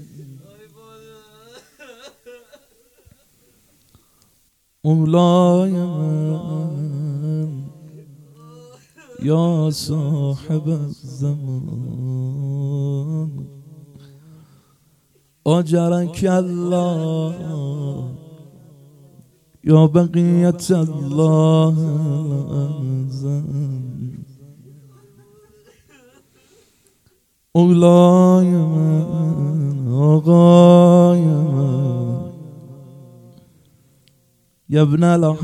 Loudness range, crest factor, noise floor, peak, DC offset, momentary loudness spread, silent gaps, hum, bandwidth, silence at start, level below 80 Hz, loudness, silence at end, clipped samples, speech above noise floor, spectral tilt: 13 LU; 18 dB; -62 dBFS; 0 dBFS; under 0.1%; 16 LU; none; none; 12 kHz; 0 s; -58 dBFS; -17 LUFS; 0 s; under 0.1%; 47 dB; -8.5 dB/octave